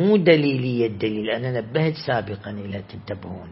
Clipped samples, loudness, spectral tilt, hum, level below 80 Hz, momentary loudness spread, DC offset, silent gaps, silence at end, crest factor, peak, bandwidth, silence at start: under 0.1%; -22 LUFS; -11.5 dB/octave; none; -58 dBFS; 17 LU; under 0.1%; none; 0 s; 20 dB; -2 dBFS; 5.8 kHz; 0 s